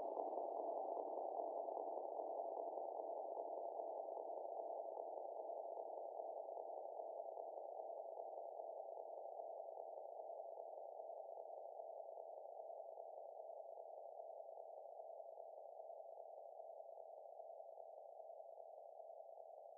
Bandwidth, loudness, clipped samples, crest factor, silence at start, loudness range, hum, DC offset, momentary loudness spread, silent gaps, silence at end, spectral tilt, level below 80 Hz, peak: 1.2 kHz; -52 LUFS; under 0.1%; 22 dB; 0 s; 9 LU; none; under 0.1%; 11 LU; none; 0 s; 15 dB/octave; under -90 dBFS; -30 dBFS